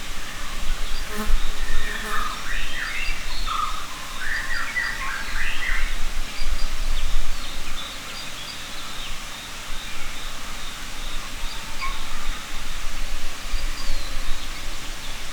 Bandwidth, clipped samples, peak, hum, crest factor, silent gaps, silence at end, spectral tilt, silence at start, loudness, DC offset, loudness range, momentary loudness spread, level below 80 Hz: 16 kHz; under 0.1%; -4 dBFS; none; 14 dB; none; 0 s; -2 dB/octave; 0 s; -30 LUFS; under 0.1%; 5 LU; 7 LU; -26 dBFS